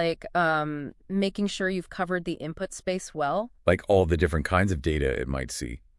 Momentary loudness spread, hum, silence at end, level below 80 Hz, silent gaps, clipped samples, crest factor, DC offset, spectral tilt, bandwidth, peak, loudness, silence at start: 10 LU; none; 0.2 s; -42 dBFS; none; under 0.1%; 22 dB; under 0.1%; -5.5 dB/octave; 12 kHz; -6 dBFS; -27 LUFS; 0 s